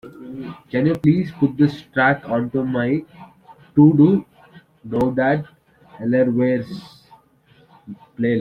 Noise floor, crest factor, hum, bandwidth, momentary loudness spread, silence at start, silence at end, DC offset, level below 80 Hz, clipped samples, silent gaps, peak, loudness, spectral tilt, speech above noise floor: -54 dBFS; 18 dB; none; 5.6 kHz; 19 LU; 0.05 s; 0 s; under 0.1%; -54 dBFS; under 0.1%; none; -2 dBFS; -19 LUFS; -9.5 dB/octave; 37 dB